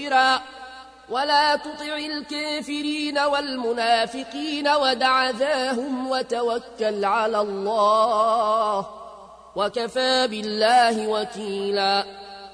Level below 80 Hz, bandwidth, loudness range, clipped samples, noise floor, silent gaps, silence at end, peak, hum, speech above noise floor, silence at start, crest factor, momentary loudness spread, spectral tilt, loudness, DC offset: -62 dBFS; 10.5 kHz; 2 LU; under 0.1%; -44 dBFS; none; 0 s; -8 dBFS; none; 21 dB; 0 s; 14 dB; 10 LU; -3 dB/octave; -22 LUFS; under 0.1%